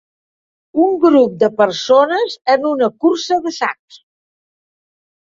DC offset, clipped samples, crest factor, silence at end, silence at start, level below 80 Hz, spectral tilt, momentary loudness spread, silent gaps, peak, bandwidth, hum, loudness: under 0.1%; under 0.1%; 14 dB; 1.65 s; 0.75 s; -64 dBFS; -4.5 dB/octave; 9 LU; none; -2 dBFS; 7.6 kHz; none; -15 LUFS